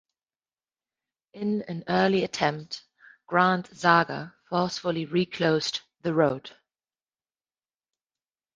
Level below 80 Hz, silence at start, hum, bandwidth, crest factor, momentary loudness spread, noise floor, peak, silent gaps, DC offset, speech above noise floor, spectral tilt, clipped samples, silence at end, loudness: -66 dBFS; 1.35 s; none; 9.6 kHz; 22 dB; 11 LU; under -90 dBFS; -6 dBFS; none; under 0.1%; over 65 dB; -5.5 dB/octave; under 0.1%; 2.05 s; -26 LUFS